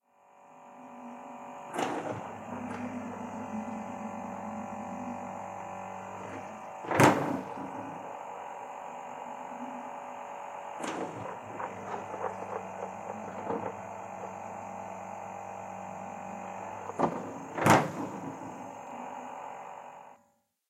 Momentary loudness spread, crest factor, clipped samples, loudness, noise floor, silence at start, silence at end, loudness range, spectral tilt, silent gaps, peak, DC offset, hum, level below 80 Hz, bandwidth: 11 LU; 30 dB; under 0.1%; -35 LUFS; -71 dBFS; 0.25 s; 0.55 s; 9 LU; -5.5 dB/octave; none; -6 dBFS; under 0.1%; none; -74 dBFS; 16 kHz